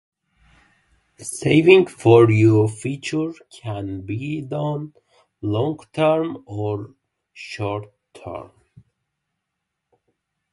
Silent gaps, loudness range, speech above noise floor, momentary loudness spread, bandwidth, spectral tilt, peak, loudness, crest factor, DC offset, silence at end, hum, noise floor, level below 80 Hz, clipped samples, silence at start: none; 17 LU; 61 dB; 22 LU; 11.5 kHz; -6.5 dB/octave; 0 dBFS; -19 LUFS; 22 dB; under 0.1%; 2.1 s; none; -80 dBFS; -54 dBFS; under 0.1%; 1.2 s